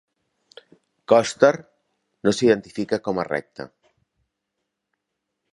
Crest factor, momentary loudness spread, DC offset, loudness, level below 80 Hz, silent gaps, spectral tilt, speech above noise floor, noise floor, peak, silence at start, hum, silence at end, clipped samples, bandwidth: 22 dB; 17 LU; under 0.1%; -21 LUFS; -64 dBFS; none; -5 dB/octave; 60 dB; -80 dBFS; -2 dBFS; 1.1 s; none; 1.9 s; under 0.1%; 11.5 kHz